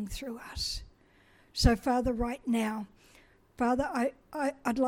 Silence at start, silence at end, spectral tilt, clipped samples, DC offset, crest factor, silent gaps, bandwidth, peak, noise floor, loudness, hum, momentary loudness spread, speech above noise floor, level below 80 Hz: 0 s; 0 s; -5 dB/octave; under 0.1%; under 0.1%; 22 dB; none; 16.5 kHz; -10 dBFS; -62 dBFS; -32 LUFS; none; 13 LU; 32 dB; -40 dBFS